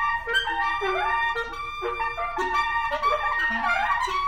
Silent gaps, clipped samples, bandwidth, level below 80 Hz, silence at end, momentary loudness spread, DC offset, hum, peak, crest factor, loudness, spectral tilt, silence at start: none; under 0.1%; 16.5 kHz; -44 dBFS; 0 s; 5 LU; under 0.1%; none; -10 dBFS; 14 dB; -24 LUFS; -2.5 dB/octave; 0 s